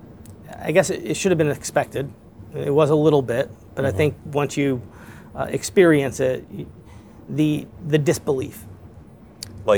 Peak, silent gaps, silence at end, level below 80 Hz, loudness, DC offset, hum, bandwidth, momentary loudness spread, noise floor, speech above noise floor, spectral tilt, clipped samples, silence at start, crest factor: -2 dBFS; none; 0 s; -52 dBFS; -21 LUFS; 0.1%; none; over 20 kHz; 21 LU; -44 dBFS; 24 dB; -6 dB/octave; under 0.1%; 0 s; 20 dB